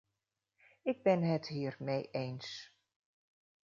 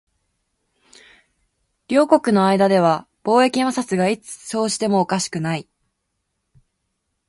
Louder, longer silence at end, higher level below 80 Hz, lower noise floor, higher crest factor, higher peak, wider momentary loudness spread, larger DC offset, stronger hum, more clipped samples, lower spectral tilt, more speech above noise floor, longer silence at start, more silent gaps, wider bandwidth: second, -36 LUFS vs -19 LUFS; second, 1.05 s vs 1.65 s; second, -80 dBFS vs -64 dBFS; first, -88 dBFS vs -75 dBFS; about the same, 22 dB vs 20 dB; second, -16 dBFS vs 0 dBFS; first, 13 LU vs 9 LU; neither; neither; neither; about the same, -6 dB/octave vs -5 dB/octave; second, 53 dB vs 57 dB; second, 0.85 s vs 1.9 s; neither; second, 7.4 kHz vs 11.5 kHz